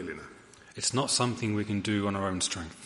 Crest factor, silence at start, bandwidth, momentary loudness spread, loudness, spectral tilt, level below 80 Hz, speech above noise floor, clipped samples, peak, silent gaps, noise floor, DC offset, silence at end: 20 dB; 0 s; 11.5 kHz; 16 LU; -29 LUFS; -3.5 dB/octave; -60 dBFS; 22 dB; under 0.1%; -12 dBFS; none; -52 dBFS; under 0.1%; 0 s